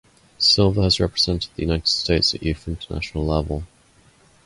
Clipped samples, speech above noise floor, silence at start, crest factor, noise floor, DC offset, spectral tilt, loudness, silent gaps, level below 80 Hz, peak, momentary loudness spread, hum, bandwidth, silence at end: under 0.1%; 34 dB; 0.4 s; 16 dB; -55 dBFS; under 0.1%; -5 dB/octave; -20 LUFS; none; -34 dBFS; -6 dBFS; 13 LU; none; 11.5 kHz; 0.8 s